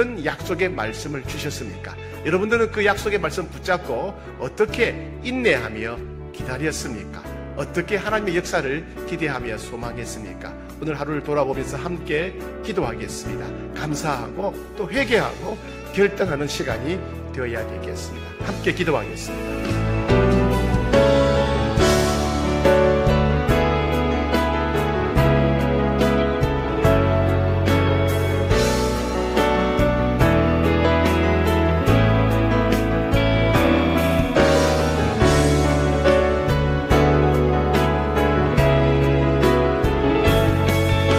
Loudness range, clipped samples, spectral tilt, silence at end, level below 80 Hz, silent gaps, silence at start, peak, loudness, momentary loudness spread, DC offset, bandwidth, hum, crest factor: 8 LU; under 0.1%; -6 dB/octave; 0 s; -30 dBFS; none; 0 s; -4 dBFS; -20 LUFS; 13 LU; under 0.1%; 16 kHz; none; 16 dB